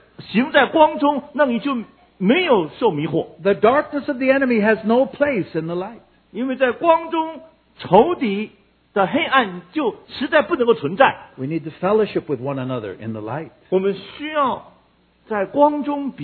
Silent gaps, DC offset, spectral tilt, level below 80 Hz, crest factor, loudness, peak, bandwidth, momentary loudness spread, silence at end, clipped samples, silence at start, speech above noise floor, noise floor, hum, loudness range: none; under 0.1%; -9.5 dB/octave; -58 dBFS; 20 dB; -19 LUFS; 0 dBFS; 4.6 kHz; 12 LU; 0 s; under 0.1%; 0.2 s; 38 dB; -57 dBFS; none; 5 LU